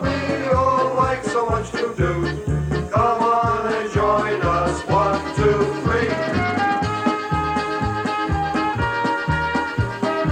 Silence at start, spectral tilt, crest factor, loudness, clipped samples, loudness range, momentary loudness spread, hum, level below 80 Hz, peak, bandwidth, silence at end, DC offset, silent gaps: 0 s; -6.5 dB/octave; 14 dB; -20 LUFS; under 0.1%; 2 LU; 5 LU; none; -36 dBFS; -6 dBFS; 10.5 kHz; 0 s; under 0.1%; none